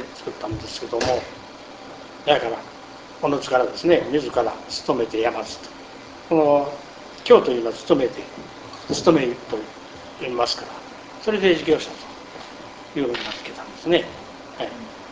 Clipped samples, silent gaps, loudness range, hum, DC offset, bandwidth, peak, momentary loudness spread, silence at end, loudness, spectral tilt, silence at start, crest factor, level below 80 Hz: under 0.1%; none; 5 LU; none; under 0.1%; 8 kHz; 0 dBFS; 21 LU; 0 s; -22 LUFS; -4.5 dB/octave; 0 s; 22 dB; -52 dBFS